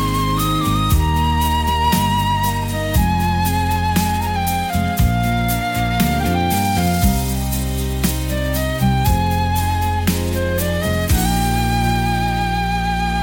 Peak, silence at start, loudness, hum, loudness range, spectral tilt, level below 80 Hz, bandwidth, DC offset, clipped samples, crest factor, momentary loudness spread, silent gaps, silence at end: -2 dBFS; 0 s; -18 LUFS; none; 1 LU; -5 dB/octave; -24 dBFS; 17 kHz; under 0.1%; under 0.1%; 14 dB; 3 LU; none; 0 s